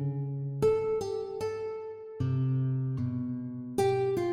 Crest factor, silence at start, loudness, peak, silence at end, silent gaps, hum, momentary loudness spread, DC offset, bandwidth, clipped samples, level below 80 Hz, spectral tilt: 16 dB; 0 s; -31 LUFS; -14 dBFS; 0 s; none; none; 9 LU; under 0.1%; 15 kHz; under 0.1%; -60 dBFS; -8 dB/octave